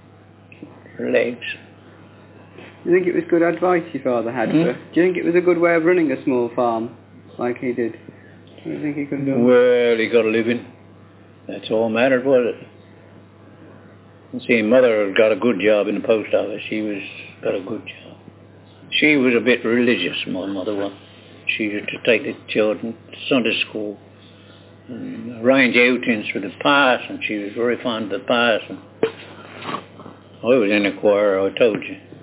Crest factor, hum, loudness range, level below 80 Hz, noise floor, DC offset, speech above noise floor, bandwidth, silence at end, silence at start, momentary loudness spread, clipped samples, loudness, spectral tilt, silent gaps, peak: 18 dB; none; 4 LU; -64 dBFS; -46 dBFS; under 0.1%; 28 dB; 4 kHz; 0.05 s; 0.6 s; 16 LU; under 0.1%; -19 LUFS; -9 dB/octave; none; -2 dBFS